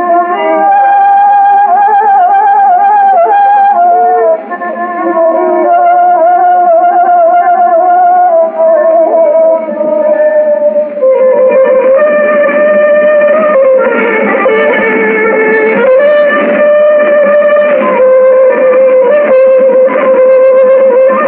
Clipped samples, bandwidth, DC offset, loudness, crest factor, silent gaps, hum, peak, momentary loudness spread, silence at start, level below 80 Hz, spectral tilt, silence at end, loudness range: under 0.1%; 3.8 kHz; under 0.1%; -6 LUFS; 6 dB; none; none; 0 dBFS; 4 LU; 0 s; -58 dBFS; -10 dB/octave; 0 s; 2 LU